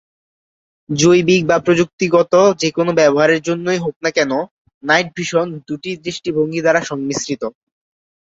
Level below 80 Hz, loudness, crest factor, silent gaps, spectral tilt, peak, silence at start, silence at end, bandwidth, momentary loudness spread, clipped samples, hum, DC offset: -56 dBFS; -16 LUFS; 16 dB; 1.93-1.98 s, 3.96-4.00 s, 4.51-4.65 s, 4.74-4.81 s; -4.5 dB/octave; -2 dBFS; 0.9 s; 0.75 s; 7.8 kHz; 12 LU; under 0.1%; none; under 0.1%